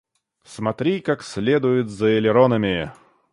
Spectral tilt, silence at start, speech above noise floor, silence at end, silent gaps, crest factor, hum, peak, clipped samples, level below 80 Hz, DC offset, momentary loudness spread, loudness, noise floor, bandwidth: -6.5 dB/octave; 0.5 s; 31 dB; 0.4 s; none; 18 dB; none; -2 dBFS; under 0.1%; -52 dBFS; under 0.1%; 10 LU; -20 LUFS; -51 dBFS; 11.5 kHz